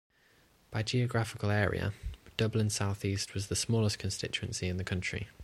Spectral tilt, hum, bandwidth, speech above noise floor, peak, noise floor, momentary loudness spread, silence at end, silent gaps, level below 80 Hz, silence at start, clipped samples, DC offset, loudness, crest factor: -4.5 dB/octave; none; 13.5 kHz; 33 dB; -14 dBFS; -66 dBFS; 7 LU; 0 s; none; -52 dBFS; 0.7 s; under 0.1%; under 0.1%; -33 LUFS; 20 dB